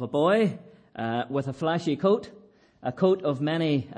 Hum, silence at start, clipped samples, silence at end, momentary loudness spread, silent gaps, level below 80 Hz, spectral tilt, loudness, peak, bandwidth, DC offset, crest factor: none; 0 s; under 0.1%; 0 s; 13 LU; none; -68 dBFS; -7.5 dB/octave; -26 LUFS; -10 dBFS; 10.5 kHz; under 0.1%; 16 dB